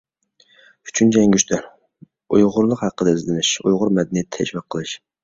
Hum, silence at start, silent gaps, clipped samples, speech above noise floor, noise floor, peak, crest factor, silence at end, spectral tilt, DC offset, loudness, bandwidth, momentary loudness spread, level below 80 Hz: none; 0.85 s; none; under 0.1%; 40 dB; -58 dBFS; -2 dBFS; 18 dB; 0.3 s; -4.5 dB/octave; under 0.1%; -18 LUFS; 8 kHz; 11 LU; -54 dBFS